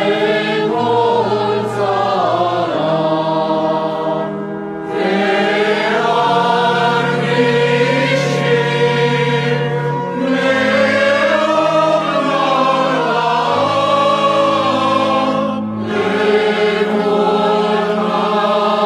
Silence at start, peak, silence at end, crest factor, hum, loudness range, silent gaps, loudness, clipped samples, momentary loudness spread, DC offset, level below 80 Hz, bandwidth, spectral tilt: 0 s; -2 dBFS; 0 s; 12 dB; none; 3 LU; none; -15 LUFS; under 0.1%; 5 LU; under 0.1%; -56 dBFS; 12.5 kHz; -5.5 dB/octave